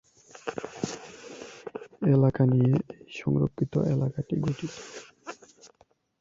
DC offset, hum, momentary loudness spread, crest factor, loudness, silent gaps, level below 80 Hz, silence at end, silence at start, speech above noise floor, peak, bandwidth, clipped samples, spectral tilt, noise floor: under 0.1%; none; 21 LU; 18 dB; -27 LUFS; none; -58 dBFS; 0.85 s; 0.45 s; 40 dB; -10 dBFS; 7.8 kHz; under 0.1%; -7.5 dB/octave; -65 dBFS